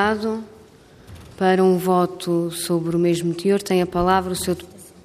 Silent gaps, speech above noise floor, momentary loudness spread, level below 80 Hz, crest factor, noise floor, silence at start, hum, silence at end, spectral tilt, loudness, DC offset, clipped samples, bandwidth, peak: none; 28 dB; 8 LU; -48 dBFS; 16 dB; -47 dBFS; 0 s; none; 0.15 s; -5.5 dB/octave; -21 LUFS; under 0.1%; under 0.1%; 15.5 kHz; -4 dBFS